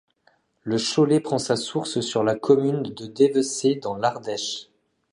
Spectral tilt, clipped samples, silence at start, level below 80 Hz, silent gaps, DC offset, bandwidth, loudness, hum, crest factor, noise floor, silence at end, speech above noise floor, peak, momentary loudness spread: -5 dB/octave; under 0.1%; 0.65 s; -66 dBFS; none; under 0.1%; 11 kHz; -23 LUFS; none; 18 dB; -64 dBFS; 0.5 s; 42 dB; -4 dBFS; 9 LU